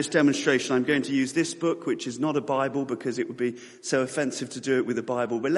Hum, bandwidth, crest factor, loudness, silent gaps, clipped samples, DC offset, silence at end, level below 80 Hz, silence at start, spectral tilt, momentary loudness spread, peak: none; 11.5 kHz; 18 dB; -26 LUFS; none; under 0.1%; under 0.1%; 0 s; -70 dBFS; 0 s; -4.5 dB/octave; 7 LU; -8 dBFS